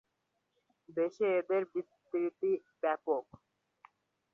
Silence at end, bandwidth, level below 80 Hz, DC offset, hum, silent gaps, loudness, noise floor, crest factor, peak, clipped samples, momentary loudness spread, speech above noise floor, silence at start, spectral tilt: 1.1 s; 6.8 kHz; -84 dBFS; under 0.1%; none; none; -35 LUFS; -82 dBFS; 18 dB; -20 dBFS; under 0.1%; 8 LU; 48 dB; 0.95 s; -7.5 dB/octave